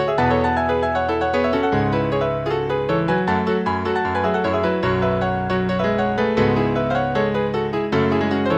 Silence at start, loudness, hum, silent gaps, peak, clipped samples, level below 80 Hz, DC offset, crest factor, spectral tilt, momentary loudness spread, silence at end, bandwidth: 0 s; -20 LUFS; none; none; -6 dBFS; under 0.1%; -40 dBFS; under 0.1%; 14 dB; -7.5 dB/octave; 3 LU; 0 s; 8.6 kHz